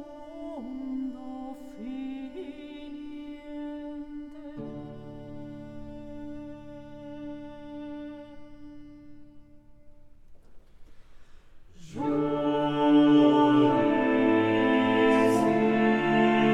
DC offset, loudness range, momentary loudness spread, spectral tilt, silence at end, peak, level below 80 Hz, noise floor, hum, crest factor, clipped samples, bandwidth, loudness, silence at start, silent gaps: under 0.1%; 21 LU; 22 LU; -6.5 dB/octave; 0 s; -10 dBFS; -54 dBFS; -50 dBFS; none; 18 dB; under 0.1%; 11.5 kHz; -24 LUFS; 0 s; none